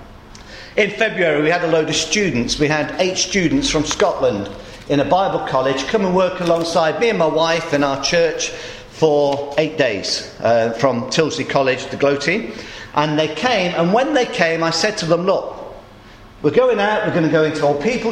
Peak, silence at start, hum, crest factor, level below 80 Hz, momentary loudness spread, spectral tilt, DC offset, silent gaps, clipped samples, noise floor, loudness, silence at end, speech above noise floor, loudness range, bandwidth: 0 dBFS; 0 s; none; 18 dB; -44 dBFS; 6 LU; -4 dB/octave; under 0.1%; none; under 0.1%; -41 dBFS; -17 LUFS; 0 s; 24 dB; 1 LU; 12 kHz